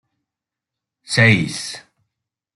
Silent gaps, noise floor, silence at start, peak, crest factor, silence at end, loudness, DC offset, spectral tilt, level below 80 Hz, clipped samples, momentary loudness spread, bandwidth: none; -86 dBFS; 1.1 s; -2 dBFS; 20 dB; 0.75 s; -16 LUFS; under 0.1%; -4.5 dB/octave; -54 dBFS; under 0.1%; 17 LU; 12 kHz